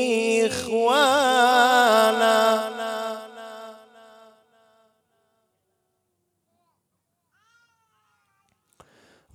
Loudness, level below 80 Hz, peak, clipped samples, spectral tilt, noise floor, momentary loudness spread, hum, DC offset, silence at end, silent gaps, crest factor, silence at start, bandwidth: -20 LUFS; -76 dBFS; -4 dBFS; under 0.1%; -2 dB/octave; -76 dBFS; 21 LU; none; under 0.1%; 5.6 s; none; 20 dB; 0 s; 16.5 kHz